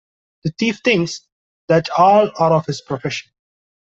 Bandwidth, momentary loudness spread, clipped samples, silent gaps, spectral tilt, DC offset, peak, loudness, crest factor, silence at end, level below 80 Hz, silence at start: 8 kHz; 15 LU; under 0.1%; 1.32-1.68 s; -5.5 dB/octave; under 0.1%; -2 dBFS; -17 LUFS; 16 dB; 0.7 s; -58 dBFS; 0.45 s